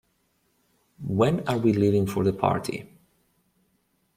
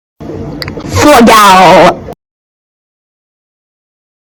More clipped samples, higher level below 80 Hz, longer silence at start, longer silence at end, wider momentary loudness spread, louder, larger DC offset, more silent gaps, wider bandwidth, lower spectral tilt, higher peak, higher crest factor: second, under 0.1% vs 6%; second, -58 dBFS vs -34 dBFS; first, 1 s vs 0.2 s; second, 1.3 s vs 2.05 s; second, 13 LU vs 20 LU; second, -24 LUFS vs -3 LUFS; neither; neither; second, 16 kHz vs over 20 kHz; first, -7.5 dB/octave vs -4 dB/octave; second, -6 dBFS vs 0 dBFS; first, 20 dB vs 8 dB